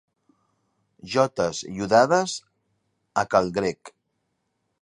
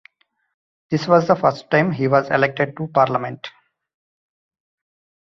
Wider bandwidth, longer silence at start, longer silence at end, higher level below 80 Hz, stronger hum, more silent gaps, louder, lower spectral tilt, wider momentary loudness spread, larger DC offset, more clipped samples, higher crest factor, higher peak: first, 11.5 kHz vs 7.4 kHz; first, 1.05 s vs 0.9 s; second, 0.95 s vs 1.75 s; about the same, -60 dBFS vs -62 dBFS; neither; neither; second, -23 LUFS vs -18 LUFS; second, -4.5 dB/octave vs -7 dB/octave; about the same, 12 LU vs 10 LU; neither; neither; about the same, 22 dB vs 20 dB; about the same, -4 dBFS vs -2 dBFS